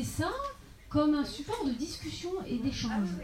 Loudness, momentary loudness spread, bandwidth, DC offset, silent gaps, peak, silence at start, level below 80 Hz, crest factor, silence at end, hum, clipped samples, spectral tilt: -33 LUFS; 10 LU; 16 kHz; under 0.1%; none; -16 dBFS; 0 s; -50 dBFS; 16 dB; 0 s; none; under 0.1%; -5.5 dB/octave